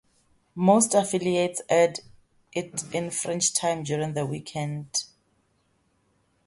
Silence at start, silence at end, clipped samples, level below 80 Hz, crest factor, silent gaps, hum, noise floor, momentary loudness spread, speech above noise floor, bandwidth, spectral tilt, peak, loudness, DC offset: 0.55 s; 1.4 s; under 0.1%; -66 dBFS; 20 dB; none; none; -69 dBFS; 12 LU; 44 dB; 12 kHz; -4 dB/octave; -6 dBFS; -25 LUFS; under 0.1%